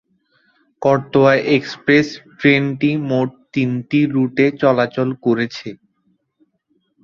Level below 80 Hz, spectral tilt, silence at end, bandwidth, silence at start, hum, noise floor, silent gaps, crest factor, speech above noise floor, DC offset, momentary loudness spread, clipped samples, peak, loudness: -58 dBFS; -7 dB/octave; 1.3 s; 7.2 kHz; 0.8 s; none; -65 dBFS; none; 16 dB; 49 dB; under 0.1%; 8 LU; under 0.1%; -2 dBFS; -17 LUFS